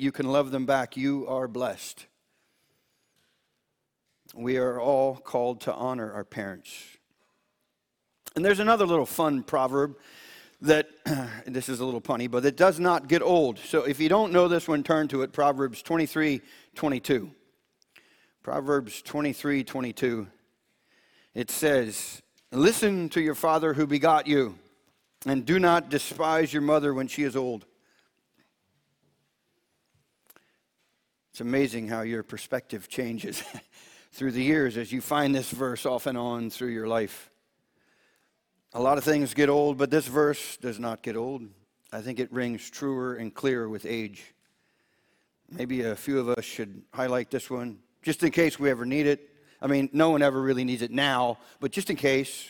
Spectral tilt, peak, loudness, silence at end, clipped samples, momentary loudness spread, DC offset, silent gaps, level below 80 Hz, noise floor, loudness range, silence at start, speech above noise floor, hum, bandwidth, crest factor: -5 dB/octave; -6 dBFS; -27 LUFS; 0 s; under 0.1%; 14 LU; under 0.1%; none; -66 dBFS; -79 dBFS; 9 LU; 0 s; 53 dB; none; 19 kHz; 22 dB